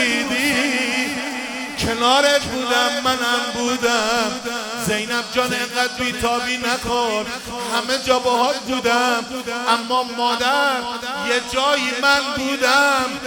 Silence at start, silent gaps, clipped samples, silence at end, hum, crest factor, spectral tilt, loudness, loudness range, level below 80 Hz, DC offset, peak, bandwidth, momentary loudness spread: 0 s; none; under 0.1%; 0 s; none; 18 dB; -2 dB/octave; -19 LUFS; 2 LU; -48 dBFS; under 0.1%; -2 dBFS; 19 kHz; 7 LU